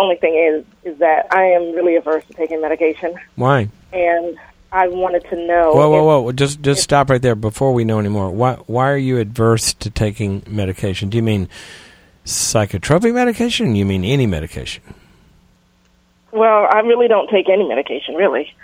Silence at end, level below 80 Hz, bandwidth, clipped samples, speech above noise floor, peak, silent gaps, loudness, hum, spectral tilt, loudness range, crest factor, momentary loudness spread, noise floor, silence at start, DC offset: 0.15 s; -42 dBFS; 16 kHz; under 0.1%; 40 dB; 0 dBFS; none; -16 LUFS; none; -5 dB/octave; 5 LU; 16 dB; 10 LU; -55 dBFS; 0 s; under 0.1%